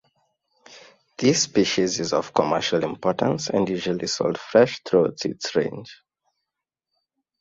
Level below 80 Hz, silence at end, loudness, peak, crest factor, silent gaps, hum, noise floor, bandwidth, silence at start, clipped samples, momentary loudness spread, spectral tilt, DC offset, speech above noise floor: -60 dBFS; 1.45 s; -22 LUFS; -2 dBFS; 22 dB; none; none; -85 dBFS; 7.8 kHz; 0.7 s; under 0.1%; 6 LU; -4 dB/octave; under 0.1%; 63 dB